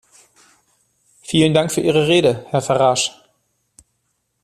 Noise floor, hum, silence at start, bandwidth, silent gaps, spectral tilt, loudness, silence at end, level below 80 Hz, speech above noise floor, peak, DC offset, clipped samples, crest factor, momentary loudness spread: -70 dBFS; none; 1.3 s; 13.5 kHz; none; -4.5 dB/octave; -16 LUFS; 1.35 s; -56 dBFS; 54 dB; 0 dBFS; under 0.1%; under 0.1%; 18 dB; 7 LU